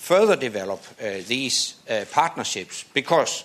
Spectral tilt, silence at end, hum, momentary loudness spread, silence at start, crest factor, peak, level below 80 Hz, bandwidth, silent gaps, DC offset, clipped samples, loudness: -2.5 dB/octave; 0 s; none; 12 LU; 0 s; 20 dB; -4 dBFS; -70 dBFS; 14 kHz; none; under 0.1%; under 0.1%; -23 LUFS